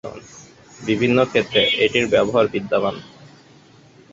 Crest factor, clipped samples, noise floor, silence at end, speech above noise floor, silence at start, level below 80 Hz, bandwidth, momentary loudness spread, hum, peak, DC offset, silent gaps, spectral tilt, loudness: 20 dB; under 0.1%; -49 dBFS; 1.05 s; 31 dB; 0.05 s; -54 dBFS; 7.8 kHz; 17 LU; none; -2 dBFS; under 0.1%; none; -5 dB/octave; -18 LUFS